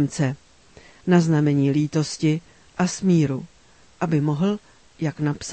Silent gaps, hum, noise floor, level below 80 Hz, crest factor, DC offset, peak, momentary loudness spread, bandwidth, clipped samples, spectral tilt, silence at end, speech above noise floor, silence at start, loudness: none; none; -50 dBFS; -58 dBFS; 18 dB; 0.1%; -4 dBFS; 12 LU; 8.8 kHz; under 0.1%; -6.5 dB/octave; 0 s; 30 dB; 0 s; -22 LUFS